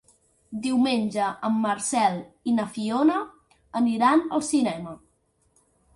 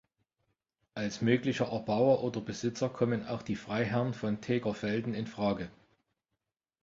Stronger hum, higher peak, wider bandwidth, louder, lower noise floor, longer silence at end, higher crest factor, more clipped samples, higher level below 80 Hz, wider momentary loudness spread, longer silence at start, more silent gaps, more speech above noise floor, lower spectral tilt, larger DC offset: neither; first, -8 dBFS vs -12 dBFS; first, 11.5 kHz vs 7.8 kHz; first, -24 LUFS vs -32 LUFS; second, -68 dBFS vs -87 dBFS; second, 1 s vs 1.15 s; about the same, 16 dB vs 20 dB; neither; about the same, -66 dBFS vs -64 dBFS; first, 12 LU vs 9 LU; second, 0.5 s vs 0.95 s; neither; second, 44 dB vs 56 dB; second, -4.5 dB/octave vs -6.5 dB/octave; neither